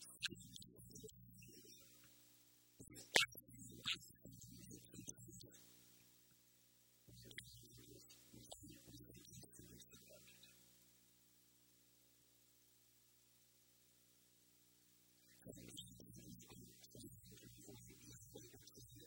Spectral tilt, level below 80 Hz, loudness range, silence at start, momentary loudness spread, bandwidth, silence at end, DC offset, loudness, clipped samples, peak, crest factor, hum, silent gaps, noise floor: -1.5 dB/octave; -78 dBFS; 19 LU; 0 s; 21 LU; 16.5 kHz; 0 s; under 0.1%; -50 LUFS; under 0.1%; -14 dBFS; 42 dB; 60 Hz at -70 dBFS; none; -74 dBFS